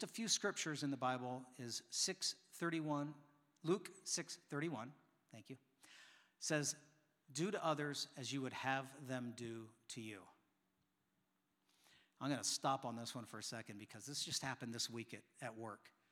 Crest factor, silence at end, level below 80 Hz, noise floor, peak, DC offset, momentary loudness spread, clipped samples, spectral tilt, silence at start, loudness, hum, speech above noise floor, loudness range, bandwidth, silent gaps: 22 dB; 0.25 s; under -90 dBFS; -85 dBFS; -24 dBFS; under 0.1%; 16 LU; under 0.1%; -3 dB/octave; 0 s; -44 LUFS; none; 40 dB; 5 LU; 17.5 kHz; none